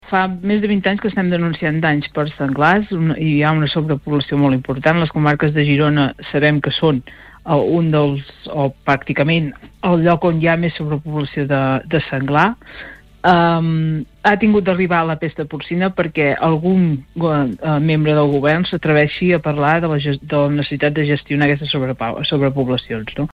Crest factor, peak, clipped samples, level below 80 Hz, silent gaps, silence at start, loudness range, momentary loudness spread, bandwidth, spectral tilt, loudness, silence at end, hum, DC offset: 14 dB; -2 dBFS; under 0.1%; -44 dBFS; none; 0.05 s; 2 LU; 7 LU; 5.6 kHz; -8.5 dB/octave; -17 LUFS; 0.05 s; none; under 0.1%